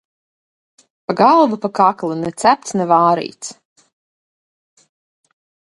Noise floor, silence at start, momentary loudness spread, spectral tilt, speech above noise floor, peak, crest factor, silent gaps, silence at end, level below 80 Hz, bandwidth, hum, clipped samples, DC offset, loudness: under -90 dBFS; 1.1 s; 17 LU; -5 dB/octave; over 75 dB; 0 dBFS; 18 dB; none; 2.25 s; -64 dBFS; 11.5 kHz; none; under 0.1%; under 0.1%; -15 LUFS